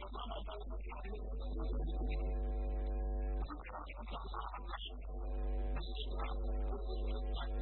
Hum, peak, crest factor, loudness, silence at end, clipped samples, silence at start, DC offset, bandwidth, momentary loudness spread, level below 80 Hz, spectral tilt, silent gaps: none; -28 dBFS; 12 dB; -43 LUFS; 0 s; under 0.1%; 0 s; under 0.1%; 4.2 kHz; 6 LU; -40 dBFS; -5.5 dB/octave; none